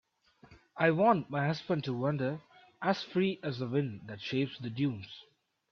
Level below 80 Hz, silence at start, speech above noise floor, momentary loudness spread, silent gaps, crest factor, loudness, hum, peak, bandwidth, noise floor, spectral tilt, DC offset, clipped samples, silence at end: -72 dBFS; 0.5 s; 30 dB; 15 LU; none; 20 dB; -32 LUFS; none; -14 dBFS; 6.8 kHz; -62 dBFS; -7.5 dB/octave; under 0.1%; under 0.1%; 0.5 s